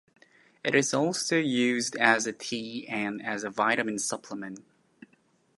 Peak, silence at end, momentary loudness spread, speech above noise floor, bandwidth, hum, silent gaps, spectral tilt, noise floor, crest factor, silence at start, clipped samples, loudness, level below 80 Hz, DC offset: -6 dBFS; 0.95 s; 13 LU; 39 dB; 11.5 kHz; none; none; -3 dB/octave; -67 dBFS; 24 dB; 0.65 s; under 0.1%; -27 LUFS; -76 dBFS; under 0.1%